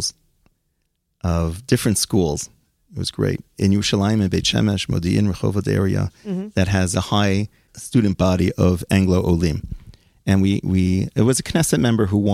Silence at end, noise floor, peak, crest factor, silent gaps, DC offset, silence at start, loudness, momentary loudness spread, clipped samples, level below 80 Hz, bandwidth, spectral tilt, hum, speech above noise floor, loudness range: 0 s; -71 dBFS; -4 dBFS; 16 dB; none; under 0.1%; 0 s; -20 LUFS; 10 LU; under 0.1%; -42 dBFS; 15.5 kHz; -5.5 dB/octave; none; 52 dB; 2 LU